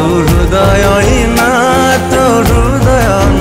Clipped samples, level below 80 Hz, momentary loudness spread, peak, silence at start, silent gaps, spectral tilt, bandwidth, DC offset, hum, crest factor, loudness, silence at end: under 0.1%; -16 dBFS; 1 LU; -2 dBFS; 0 s; none; -5.5 dB/octave; 16.5 kHz; under 0.1%; none; 6 dB; -9 LUFS; 0 s